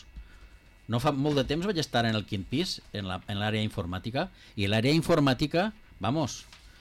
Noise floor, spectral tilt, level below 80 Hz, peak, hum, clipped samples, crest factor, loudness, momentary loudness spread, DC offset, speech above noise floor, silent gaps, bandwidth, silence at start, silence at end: -53 dBFS; -5.5 dB/octave; -50 dBFS; -16 dBFS; none; under 0.1%; 12 dB; -29 LUFS; 10 LU; under 0.1%; 25 dB; none; 16 kHz; 0.1 s; 0.15 s